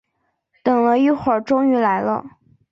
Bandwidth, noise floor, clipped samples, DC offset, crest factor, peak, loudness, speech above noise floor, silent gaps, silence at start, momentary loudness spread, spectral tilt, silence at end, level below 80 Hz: 6.8 kHz; -71 dBFS; under 0.1%; under 0.1%; 14 dB; -4 dBFS; -18 LUFS; 54 dB; none; 0.65 s; 8 LU; -7.5 dB/octave; 0.45 s; -58 dBFS